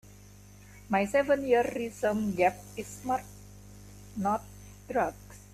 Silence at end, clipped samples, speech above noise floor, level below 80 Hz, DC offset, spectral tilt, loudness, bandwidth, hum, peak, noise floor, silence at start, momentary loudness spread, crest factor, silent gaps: 0.15 s; under 0.1%; 23 dB; -56 dBFS; under 0.1%; -5.5 dB/octave; -30 LUFS; 15 kHz; 50 Hz at -50 dBFS; -12 dBFS; -52 dBFS; 0.05 s; 24 LU; 18 dB; none